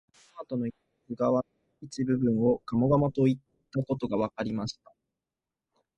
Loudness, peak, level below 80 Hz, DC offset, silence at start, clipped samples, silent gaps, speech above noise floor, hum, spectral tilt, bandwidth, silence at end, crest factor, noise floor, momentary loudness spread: -29 LUFS; -12 dBFS; -60 dBFS; under 0.1%; 0.35 s; under 0.1%; none; 62 dB; none; -8 dB/octave; 8.8 kHz; 1.25 s; 18 dB; -90 dBFS; 16 LU